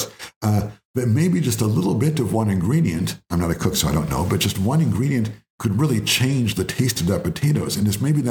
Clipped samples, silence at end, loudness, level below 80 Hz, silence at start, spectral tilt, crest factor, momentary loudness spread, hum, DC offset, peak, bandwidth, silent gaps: under 0.1%; 0 s; -21 LUFS; -44 dBFS; 0 s; -5.5 dB/octave; 14 dB; 6 LU; none; under 0.1%; -6 dBFS; 20 kHz; 0.36-0.41 s, 0.85-0.94 s, 5.50-5.58 s